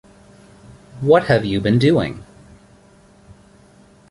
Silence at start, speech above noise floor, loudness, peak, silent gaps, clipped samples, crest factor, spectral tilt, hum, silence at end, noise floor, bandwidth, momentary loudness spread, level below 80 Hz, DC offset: 0.95 s; 34 dB; -17 LUFS; -2 dBFS; none; under 0.1%; 18 dB; -7.5 dB/octave; none; 1.85 s; -49 dBFS; 11.5 kHz; 12 LU; -48 dBFS; under 0.1%